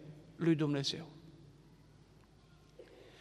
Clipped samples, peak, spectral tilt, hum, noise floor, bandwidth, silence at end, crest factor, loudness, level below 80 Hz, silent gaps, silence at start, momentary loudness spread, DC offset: under 0.1%; -20 dBFS; -6 dB/octave; none; -63 dBFS; 11.5 kHz; 0.1 s; 20 dB; -35 LUFS; -70 dBFS; none; 0 s; 26 LU; under 0.1%